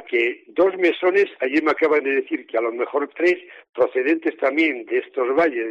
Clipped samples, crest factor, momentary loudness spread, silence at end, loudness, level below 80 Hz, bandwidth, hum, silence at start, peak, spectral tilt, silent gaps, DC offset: under 0.1%; 14 dB; 6 LU; 0 s; -21 LUFS; -70 dBFS; 7.6 kHz; none; 0 s; -8 dBFS; -5 dB/octave; 3.69-3.73 s; under 0.1%